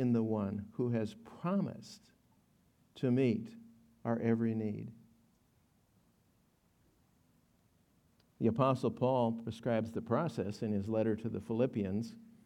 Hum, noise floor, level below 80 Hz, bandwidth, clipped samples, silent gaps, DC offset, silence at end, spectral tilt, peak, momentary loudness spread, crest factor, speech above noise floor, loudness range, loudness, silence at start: none; -72 dBFS; -76 dBFS; 11 kHz; under 0.1%; none; under 0.1%; 0.25 s; -8.5 dB/octave; -16 dBFS; 11 LU; 20 dB; 38 dB; 6 LU; -35 LUFS; 0 s